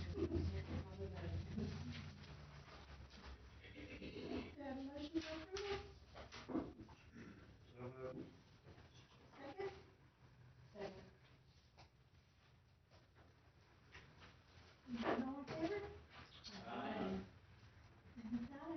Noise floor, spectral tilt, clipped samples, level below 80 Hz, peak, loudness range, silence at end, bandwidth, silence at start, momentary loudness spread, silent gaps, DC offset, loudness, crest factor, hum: -71 dBFS; -5.5 dB/octave; under 0.1%; -66 dBFS; -28 dBFS; 14 LU; 0 s; 6.2 kHz; 0 s; 22 LU; none; under 0.1%; -50 LUFS; 22 dB; none